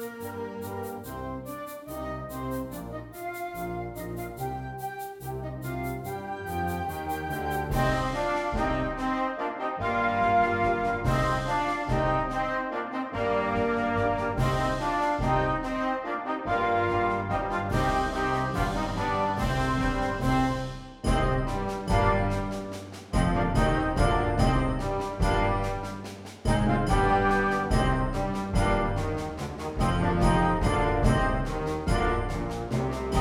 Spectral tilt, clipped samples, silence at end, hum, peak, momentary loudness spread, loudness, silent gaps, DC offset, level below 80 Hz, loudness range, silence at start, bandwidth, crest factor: -6.5 dB/octave; under 0.1%; 0 s; none; -8 dBFS; 12 LU; -28 LUFS; none; under 0.1%; -36 dBFS; 9 LU; 0 s; 18 kHz; 18 dB